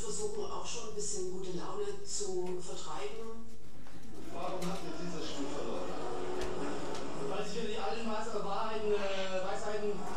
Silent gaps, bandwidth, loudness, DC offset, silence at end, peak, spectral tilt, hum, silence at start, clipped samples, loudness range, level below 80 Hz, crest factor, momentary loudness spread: none; 14.5 kHz; -39 LUFS; 3%; 0 s; -20 dBFS; -4 dB/octave; none; 0 s; under 0.1%; 5 LU; -58 dBFS; 16 dB; 8 LU